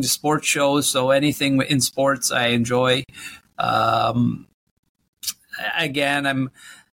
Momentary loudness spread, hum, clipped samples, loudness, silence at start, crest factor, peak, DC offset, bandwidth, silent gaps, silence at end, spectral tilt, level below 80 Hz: 11 LU; none; under 0.1%; -20 LUFS; 0 s; 16 dB; -6 dBFS; under 0.1%; 17 kHz; 4.54-4.83 s, 4.89-4.95 s, 5.08-5.13 s; 0.25 s; -3.5 dB/octave; -56 dBFS